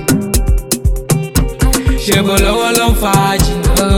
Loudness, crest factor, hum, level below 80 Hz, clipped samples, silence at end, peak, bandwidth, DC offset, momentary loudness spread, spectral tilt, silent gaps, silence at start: -13 LUFS; 12 dB; none; -16 dBFS; under 0.1%; 0 s; 0 dBFS; 20 kHz; 1%; 4 LU; -4.5 dB/octave; none; 0 s